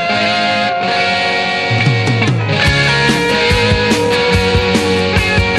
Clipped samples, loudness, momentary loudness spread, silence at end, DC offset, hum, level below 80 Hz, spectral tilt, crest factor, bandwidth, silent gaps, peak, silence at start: under 0.1%; -12 LUFS; 3 LU; 0 s; under 0.1%; none; -28 dBFS; -5 dB/octave; 12 dB; 13 kHz; none; 0 dBFS; 0 s